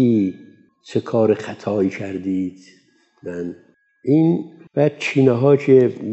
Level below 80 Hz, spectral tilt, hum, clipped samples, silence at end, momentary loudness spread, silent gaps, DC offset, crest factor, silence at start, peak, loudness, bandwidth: -68 dBFS; -8 dB/octave; none; under 0.1%; 0 s; 15 LU; none; under 0.1%; 18 dB; 0 s; -2 dBFS; -19 LUFS; 8.2 kHz